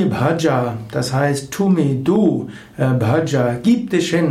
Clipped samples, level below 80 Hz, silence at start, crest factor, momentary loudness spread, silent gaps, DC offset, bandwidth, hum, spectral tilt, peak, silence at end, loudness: under 0.1%; -50 dBFS; 0 s; 14 dB; 6 LU; none; under 0.1%; 15.5 kHz; none; -6.5 dB/octave; -4 dBFS; 0 s; -17 LUFS